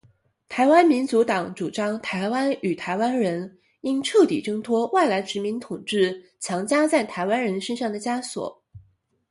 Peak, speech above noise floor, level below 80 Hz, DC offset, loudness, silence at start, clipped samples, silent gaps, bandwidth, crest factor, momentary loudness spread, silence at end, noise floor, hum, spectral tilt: -4 dBFS; 38 dB; -66 dBFS; under 0.1%; -23 LUFS; 0.5 s; under 0.1%; none; 11.5 kHz; 20 dB; 12 LU; 0.5 s; -61 dBFS; none; -4.5 dB/octave